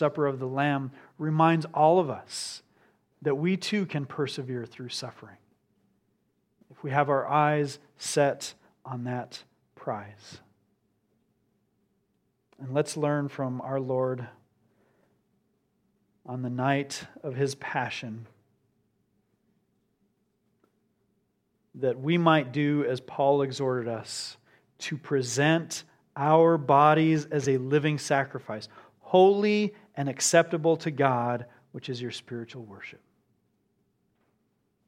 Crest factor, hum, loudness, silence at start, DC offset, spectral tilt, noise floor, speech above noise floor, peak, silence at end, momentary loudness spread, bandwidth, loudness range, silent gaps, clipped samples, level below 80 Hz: 24 dB; none; -27 LUFS; 0 s; under 0.1%; -5.5 dB/octave; -74 dBFS; 47 dB; -6 dBFS; 1.95 s; 18 LU; 15.5 kHz; 14 LU; none; under 0.1%; -76 dBFS